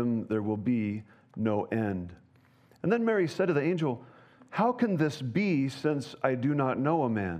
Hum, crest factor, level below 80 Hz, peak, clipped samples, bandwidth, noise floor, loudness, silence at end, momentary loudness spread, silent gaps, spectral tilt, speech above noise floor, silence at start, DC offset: none; 18 dB; -72 dBFS; -10 dBFS; under 0.1%; 10.5 kHz; -61 dBFS; -29 LUFS; 0 s; 8 LU; none; -7.5 dB/octave; 33 dB; 0 s; under 0.1%